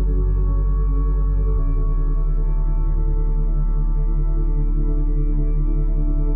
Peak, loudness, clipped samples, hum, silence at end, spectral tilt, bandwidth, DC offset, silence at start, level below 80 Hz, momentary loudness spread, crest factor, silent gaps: -10 dBFS; -23 LUFS; under 0.1%; none; 0 s; -13.5 dB/octave; 1.8 kHz; under 0.1%; 0 s; -18 dBFS; 2 LU; 6 dB; none